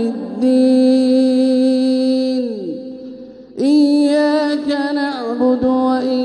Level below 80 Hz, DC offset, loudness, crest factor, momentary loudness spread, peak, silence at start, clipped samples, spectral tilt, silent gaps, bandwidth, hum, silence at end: -56 dBFS; under 0.1%; -15 LUFS; 10 dB; 15 LU; -4 dBFS; 0 s; under 0.1%; -5.5 dB/octave; none; 10.5 kHz; none; 0 s